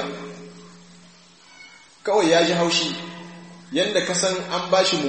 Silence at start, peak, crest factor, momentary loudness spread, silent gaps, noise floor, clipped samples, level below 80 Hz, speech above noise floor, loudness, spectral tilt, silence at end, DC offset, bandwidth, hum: 0 s; -6 dBFS; 18 dB; 22 LU; none; -50 dBFS; under 0.1%; -68 dBFS; 30 dB; -21 LUFS; -3 dB/octave; 0 s; 0.1%; 8.8 kHz; none